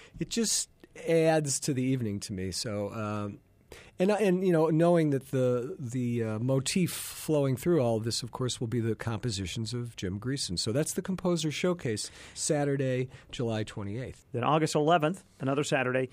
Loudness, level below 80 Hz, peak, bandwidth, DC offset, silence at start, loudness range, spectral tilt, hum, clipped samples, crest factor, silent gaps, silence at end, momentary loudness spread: -30 LUFS; -60 dBFS; -12 dBFS; 15.5 kHz; under 0.1%; 0 s; 4 LU; -5 dB/octave; none; under 0.1%; 18 dB; none; 0.05 s; 10 LU